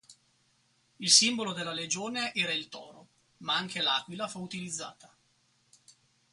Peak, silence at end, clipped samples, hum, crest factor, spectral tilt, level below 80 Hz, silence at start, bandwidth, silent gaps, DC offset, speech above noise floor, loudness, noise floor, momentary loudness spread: -6 dBFS; 1.25 s; under 0.1%; none; 26 dB; -1 dB/octave; -78 dBFS; 0.1 s; 11.5 kHz; none; under 0.1%; 39 dB; -28 LUFS; -70 dBFS; 19 LU